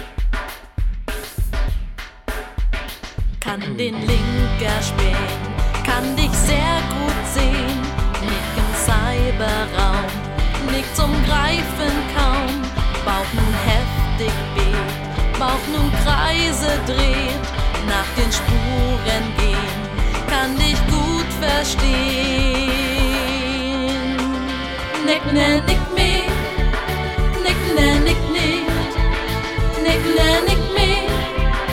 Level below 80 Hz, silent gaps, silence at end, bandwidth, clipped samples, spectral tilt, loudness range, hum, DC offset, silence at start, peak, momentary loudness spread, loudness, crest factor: -22 dBFS; none; 0 s; 16.5 kHz; under 0.1%; -4.5 dB/octave; 4 LU; none; 0.4%; 0 s; 0 dBFS; 8 LU; -19 LUFS; 18 dB